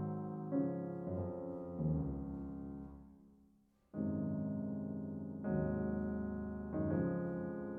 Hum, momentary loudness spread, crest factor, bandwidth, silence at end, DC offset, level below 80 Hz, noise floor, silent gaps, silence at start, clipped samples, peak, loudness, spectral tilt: none; 9 LU; 16 dB; 2.7 kHz; 0 s; under 0.1%; -56 dBFS; -71 dBFS; none; 0 s; under 0.1%; -24 dBFS; -41 LUFS; -12 dB/octave